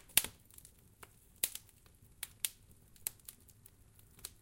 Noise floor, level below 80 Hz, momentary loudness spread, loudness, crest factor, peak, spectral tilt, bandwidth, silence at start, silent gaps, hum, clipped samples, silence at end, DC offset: -63 dBFS; -66 dBFS; 24 LU; -39 LUFS; 38 dB; -6 dBFS; 0.5 dB/octave; 17 kHz; 0.1 s; none; none; under 0.1%; 0.15 s; under 0.1%